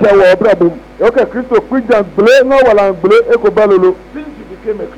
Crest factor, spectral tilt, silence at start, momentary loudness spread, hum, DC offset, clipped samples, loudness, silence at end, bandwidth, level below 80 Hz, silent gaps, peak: 6 dB; -6 dB/octave; 0 s; 15 LU; none; under 0.1%; under 0.1%; -9 LUFS; 0 s; 11.5 kHz; -40 dBFS; none; -2 dBFS